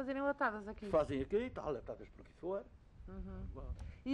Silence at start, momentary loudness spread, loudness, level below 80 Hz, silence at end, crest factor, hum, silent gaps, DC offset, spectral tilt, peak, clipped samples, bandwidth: 0 s; 16 LU; -41 LUFS; -54 dBFS; 0 s; 18 dB; none; none; under 0.1%; -7.5 dB/octave; -22 dBFS; under 0.1%; 10.5 kHz